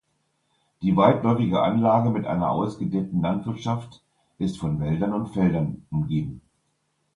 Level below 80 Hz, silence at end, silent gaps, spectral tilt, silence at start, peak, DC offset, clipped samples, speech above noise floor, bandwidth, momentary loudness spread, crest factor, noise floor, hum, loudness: -50 dBFS; 0.75 s; none; -8.5 dB/octave; 0.8 s; -4 dBFS; under 0.1%; under 0.1%; 49 dB; 10.5 kHz; 10 LU; 20 dB; -72 dBFS; none; -24 LUFS